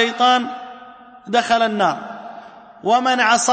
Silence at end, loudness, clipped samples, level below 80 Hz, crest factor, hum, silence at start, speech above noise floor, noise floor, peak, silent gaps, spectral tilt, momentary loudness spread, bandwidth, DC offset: 0 s; -18 LUFS; under 0.1%; -64 dBFS; 16 dB; none; 0 s; 25 dB; -41 dBFS; -4 dBFS; none; -2 dB/octave; 20 LU; 8.8 kHz; under 0.1%